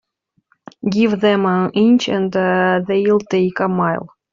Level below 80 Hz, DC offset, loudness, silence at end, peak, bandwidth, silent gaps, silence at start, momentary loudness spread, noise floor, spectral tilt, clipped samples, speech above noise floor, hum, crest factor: -58 dBFS; under 0.1%; -16 LUFS; 0.25 s; -4 dBFS; 7.6 kHz; none; 0.85 s; 6 LU; -62 dBFS; -5 dB/octave; under 0.1%; 47 dB; none; 14 dB